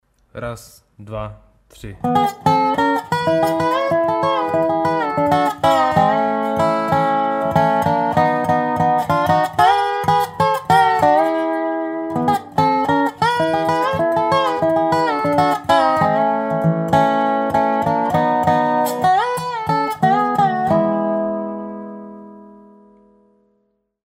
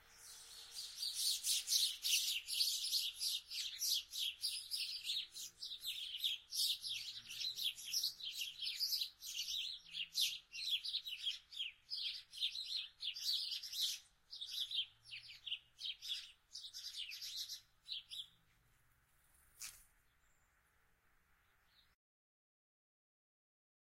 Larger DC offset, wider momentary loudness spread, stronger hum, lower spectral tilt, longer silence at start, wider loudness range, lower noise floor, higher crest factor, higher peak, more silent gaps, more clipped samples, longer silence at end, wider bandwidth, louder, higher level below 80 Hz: neither; second, 8 LU vs 14 LU; neither; first, -6 dB/octave vs 4.5 dB/octave; first, 0.35 s vs 0 s; second, 3 LU vs 17 LU; second, -66 dBFS vs -76 dBFS; second, 16 dB vs 24 dB; first, -2 dBFS vs -22 dBFS; neither; neither; second, 1.6 s vs 4 s; about the same, 16 kHz vs 16 kHz; first, -17 LUFS vs -40 LUFS; first, -50 dBFS vs -80 dBFS